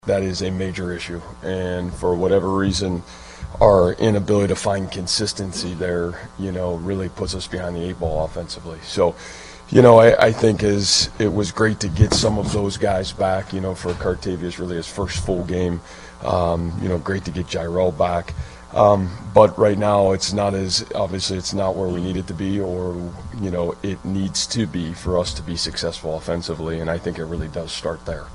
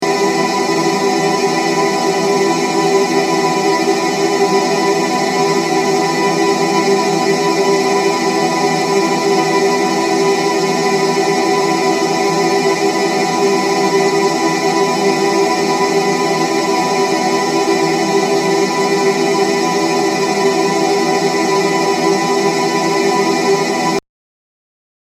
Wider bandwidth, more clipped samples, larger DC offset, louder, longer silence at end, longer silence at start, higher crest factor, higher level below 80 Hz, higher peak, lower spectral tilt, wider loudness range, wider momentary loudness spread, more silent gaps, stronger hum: second, 11.5 kHz vs 15 kHz; neither; neither; second, -20 LUFS vs -14 LUFS; second, 0 s vs 1.2 s; about the same, 0.05 s vs 0 s; first, 20 dB vs 14 dB; first, -38 dBFS vs -60 dBFS; about the same, 0 dBFS vs 0 dBFS; about the same, -5 dB/octave vs -4 dB/octave; first, 9 LU vs 0 LU; first, 12 LU vs 1 LU; neither; neither